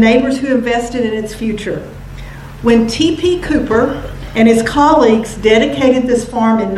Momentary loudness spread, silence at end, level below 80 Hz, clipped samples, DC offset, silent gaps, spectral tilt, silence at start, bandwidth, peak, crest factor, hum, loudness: 14 LU; 0 s; -32 dBFS; under 0.1%; under 0.1%; none; -5.5 dB/octave; 0 s; 13 kHz; 0 dBFS; 12 dB; none; -13 LUFS